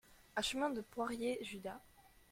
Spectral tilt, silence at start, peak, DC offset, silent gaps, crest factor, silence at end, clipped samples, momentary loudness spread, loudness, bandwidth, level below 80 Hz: -3 dB/octave; 0.1 s; -24 dBFS; under 0.1%; none; 18 dB; 0.25 s; under 0.1%; 11 LU; -41 LUFS; 16.5 kHz; -68 dBFS